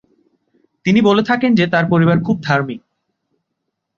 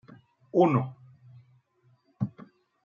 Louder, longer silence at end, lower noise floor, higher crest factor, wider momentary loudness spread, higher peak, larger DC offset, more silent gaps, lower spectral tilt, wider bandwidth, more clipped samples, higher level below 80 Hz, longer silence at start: first, -15 LUFS vs -28 LUFS; first, 1.2 s vs 0.55 s; first, -75 dBFS vs -66 dBFS; second, 16 dB vs 22 dB; about the same, 10 LU vs 12 LU; first, 0 dBFS vs -8 dBFS; neither; neither; second, -7.5 dB/octave vs -10 dB/octave; about the same, 7.2 kHz vs 7 kHz; neither; first, -54 dBFS vs -74 dBFS; first, 0.85 s vs 0.55 s